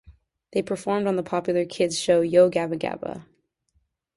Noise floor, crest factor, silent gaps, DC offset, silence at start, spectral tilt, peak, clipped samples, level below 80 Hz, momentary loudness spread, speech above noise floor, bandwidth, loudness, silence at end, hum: -70 dBFS; 20 dB; none; under 0.1%; 0.1 s; -5 dB/octave; -6 dBFS; under 0.1%; -60 dBFS; 12 LU; 48 dB; 11.5 kHz; -23 LUFS; 0.95 s; none